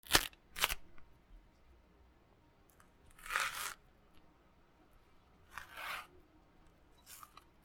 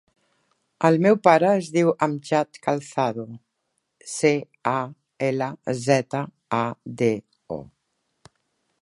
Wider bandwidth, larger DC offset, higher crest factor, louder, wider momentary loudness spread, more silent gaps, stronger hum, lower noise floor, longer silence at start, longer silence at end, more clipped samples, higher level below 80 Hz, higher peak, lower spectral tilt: first, 19 kHz vs 11.5 kHz; neither; first, 38 dB vs 22 dB; second, -38 LUFS vs -23 LUFS; first, 22 LU vs 18 LU; neither; neither; second, -67 dBFS vs -76 dBFS; second, 0.05 s vs 0.8 s; second, 0.25 s vs 1.15 s; neither; first, -60 dBFS vs -68 dBFS; second, -6 dBFS vs -2 dBFS; second, -0.5 dB/octave vs -6 dB/octave